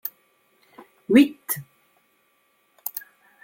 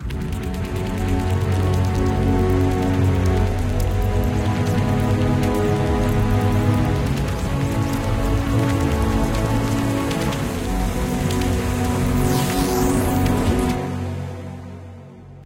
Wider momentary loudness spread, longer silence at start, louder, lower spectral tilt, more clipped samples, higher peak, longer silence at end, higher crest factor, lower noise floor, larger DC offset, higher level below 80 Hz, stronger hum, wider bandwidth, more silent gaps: first, 18 LU vs 7 LU; about the same, 0.05 s vs 0 s; about the same, -23 LUFS vs -21 LUFS; second, -4.5 dB/octave vs -6.5 dB/octave; neither; about the same, -4 dBFS vs -6 dBFS; first, 0.45 s vs 0 s; first, 22 dB vs 14 dB; first, -66 dBFS vs -39 dBFS; neither; second, -68 dBFS vs -28 dBFS; neither; about the same, 17 kHz vs 16.5 kHz; neither